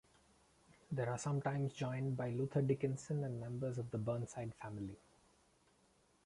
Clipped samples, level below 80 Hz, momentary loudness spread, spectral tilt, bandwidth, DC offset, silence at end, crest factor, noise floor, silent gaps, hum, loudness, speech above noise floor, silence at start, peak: under 0.1%; -70 dBFS; 10 LU; -7 dB/octave; 11.5 kHz; under 0.1%; 1.3 s; 18 dB; -73 dBFS; none; none; -41 LUFS; 33 dB; 0.9 s; -24 dBFS